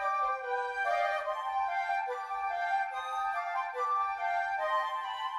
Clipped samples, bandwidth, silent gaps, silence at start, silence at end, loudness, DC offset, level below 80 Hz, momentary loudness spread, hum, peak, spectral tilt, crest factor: under 0.1%; 12.5 kHz; none; 0 s; 0 s; -32 LUFS; under 0.1%; -72 dBFS; 4 LU; none; -20 dBFS; 0 dB/octave; 14 dB